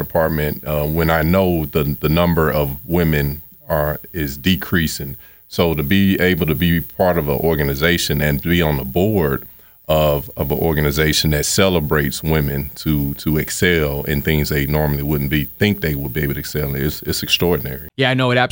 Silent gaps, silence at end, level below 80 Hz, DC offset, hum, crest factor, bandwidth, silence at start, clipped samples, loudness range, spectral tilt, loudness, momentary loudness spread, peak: none; 0 s; -34 dBFS; under 0.1%; none; 16 dB; over 20 kHz; 0 s; under 0.1%; 2 LU; -5 dB/octave; -18 LUFS; 7 LU; 0 dBFS